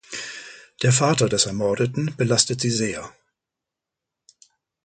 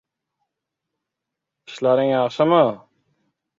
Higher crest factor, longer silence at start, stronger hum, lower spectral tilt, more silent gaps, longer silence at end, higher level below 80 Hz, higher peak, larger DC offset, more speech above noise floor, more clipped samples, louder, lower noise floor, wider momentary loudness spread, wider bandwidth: about the same, 22 dB vs 20 dB; second, 0.1 s vs 1.7 s; neither; second, -4 dB/octave vs -7 dB/octave; neither; first, 1.75 s vs 0.85 s; first, -56 dBFS vs -68 dBFS; about the same, -2 dBFS vs -4 dBFS; neither; about the same, 65 dB vs 66 dB; neither; about the same, -21 LUFS vs -19 LUFS; about the same, -86 dBFS vs -83 dBFS; about the same, 16 LU vs 18 LU; first, 9.6 kHz vs 7.6 kHz